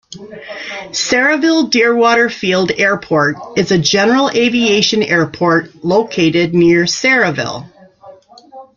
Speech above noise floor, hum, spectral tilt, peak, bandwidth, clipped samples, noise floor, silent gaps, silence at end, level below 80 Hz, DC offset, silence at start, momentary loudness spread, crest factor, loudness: 27 dB; none; -4 dB/octave; 0 dBFS; 7.6 kHz; under 0.1%; -40 dBFS; none; 0.15 s; -52 dBFS; under 0.1%; 0.1 s; 11 LU; 14 dB; -12 LUFS